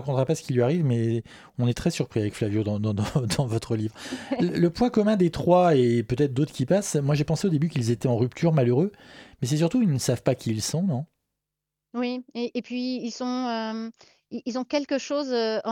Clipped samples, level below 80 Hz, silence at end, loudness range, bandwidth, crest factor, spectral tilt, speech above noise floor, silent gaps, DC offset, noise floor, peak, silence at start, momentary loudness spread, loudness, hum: under 0.1%; -54 dBFS; 0 s; 7 LU; 16.5 kHz; 18 dB; -6.5 dB/octave; 61 dB; none; under 0.1%; -86 dBFS; -6 dBFS; 0 s; 10 LU; -25 LUFS; none